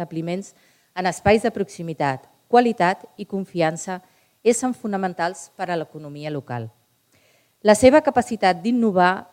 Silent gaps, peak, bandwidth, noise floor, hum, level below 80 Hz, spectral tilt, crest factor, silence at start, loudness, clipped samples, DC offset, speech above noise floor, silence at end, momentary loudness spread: none; 0 dBFS; 16 kHz; -61 dBFS; none; -54 dBFS; -5 dB/octave; 22 dB; 0 s; -21 LUFS; under 0.1%; under 0.1%; 40 dB; 0.1 s; 15 LU